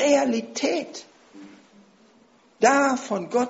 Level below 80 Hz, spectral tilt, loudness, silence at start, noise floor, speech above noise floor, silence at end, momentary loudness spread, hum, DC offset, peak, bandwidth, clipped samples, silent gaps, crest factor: -72 dBFS; -2.5 dB/octave; -22 LUFS; 0 s; -57 dBFS; 35 dB; 0 s; 13 LU; none; under 0.1%; -4 dBFS; 8 kHz; under 0.1%; none; 20 dB